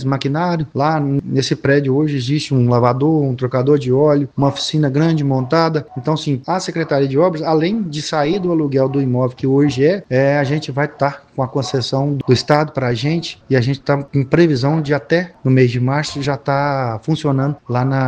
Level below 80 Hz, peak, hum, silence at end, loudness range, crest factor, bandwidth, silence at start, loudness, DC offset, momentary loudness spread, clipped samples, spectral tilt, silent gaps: -50 dBFS; 0 dBFS; none; 0 s; 2 LU; 16 dB; 9.2 kHz; 0 s; -16 LUFS; under 0.1%; 6 LU; under 0.1%; -7 dB/octave; none